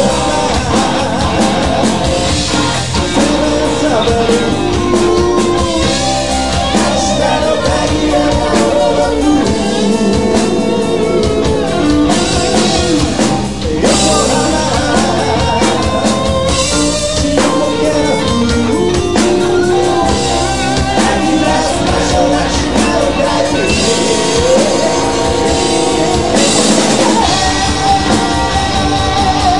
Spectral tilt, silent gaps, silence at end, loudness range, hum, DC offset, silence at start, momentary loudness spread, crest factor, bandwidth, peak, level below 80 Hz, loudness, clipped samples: -4 dB/octave; none; 0 s; 1 LU; none; 3%; 0 s; 3 LU; 12 dB; 11.5 kHz; 0 dBFS; -26 dBFS; -12 LUFS; under 0.1%